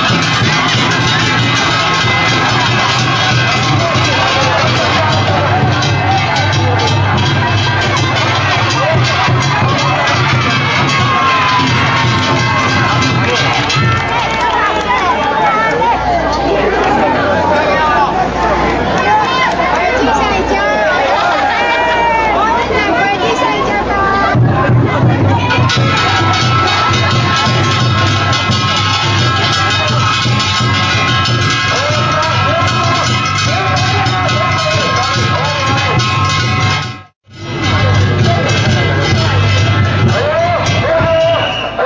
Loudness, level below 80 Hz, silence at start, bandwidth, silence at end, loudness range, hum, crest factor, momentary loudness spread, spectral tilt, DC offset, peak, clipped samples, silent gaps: -11 LUFS; -30 dBFS; 0 s; 8 kHz; 0 s; 1 LU; none; 10 dB; 2 LU; -4.5 dB/octave; under 0.1%; 0 dBFS; under 0.1%; 37.16-37.21 s